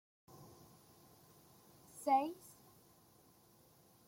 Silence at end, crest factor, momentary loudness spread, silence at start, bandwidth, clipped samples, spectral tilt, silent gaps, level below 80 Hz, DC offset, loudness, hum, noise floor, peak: 1.75 s; 22 dB; 29 LU; 0.4 s; 16.5 kHz; under 0.1%; -4.5 dB/octave; none; -84 dBFS; under 0.1%; -37 LUFS; none; -68 dBFS; -22 dBFS